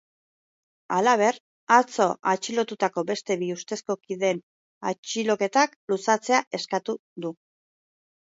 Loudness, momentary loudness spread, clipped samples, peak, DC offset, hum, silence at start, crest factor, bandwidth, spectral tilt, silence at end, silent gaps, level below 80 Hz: -25 LUFS; 13 LU; under 0.1%; -4 dBFS; under 0.1%; none; 0.9 s; 22 dB; 8 kHz; -3.5 dB/octave; 0.95 s; 1.40-1.67 s, 4.43-4.81 s, 4.98-5.03 s, 5.76-5.88 s, 6.47-6.51 s, 6.99-7.16 s; -78 dBFS